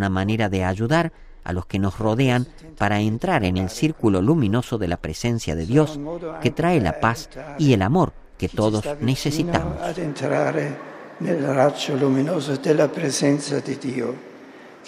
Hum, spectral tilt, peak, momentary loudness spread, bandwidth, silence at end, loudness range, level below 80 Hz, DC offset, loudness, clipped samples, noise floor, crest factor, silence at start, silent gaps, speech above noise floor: none; -6 dB/octave; -2 dBFS; 10 LU; 15.5 kHz; 0 s; 2 LU; -42 dBFS; under 0.1%; -22 LUFS; under 0.1%; -43 dBFS; 20 dB; 0 s; none; 22 dB